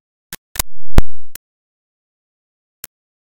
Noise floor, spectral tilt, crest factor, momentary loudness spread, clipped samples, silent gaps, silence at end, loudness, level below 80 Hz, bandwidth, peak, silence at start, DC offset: under -90 dBFS; -4 dB/octave; 12 dB; 17 LU; 0.1%; 0.38-0.55 s; 1.95 s; -22 LUFS; -24 dBFS; 17 kHz; 0 dBFS; 0.3 s; under 0.1%